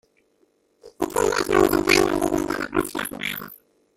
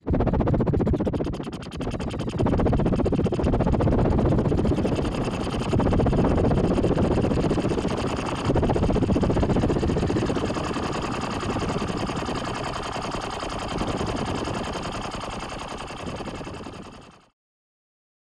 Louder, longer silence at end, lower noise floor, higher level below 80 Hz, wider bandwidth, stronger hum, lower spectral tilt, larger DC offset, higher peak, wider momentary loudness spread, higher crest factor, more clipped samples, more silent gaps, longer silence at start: first, -22 LUFS vs -25 LUFS; second, 0.4 s vs 1.2 s; first, -65 dBFS vs -45 dBFS; second, -46 dBFS vs -32 dBFS; first, 16.5 kHz vs 11.5 kHz; neither; second, -3.5 dB/octave vs -7 dB/octave; neither; first, -2 dBFS vs -10 dBFS; about the same, 12 LU vs 11 LU; first, 20 dB vs 14 dB; neither; neither; first, 0.85 s vs 0.05 s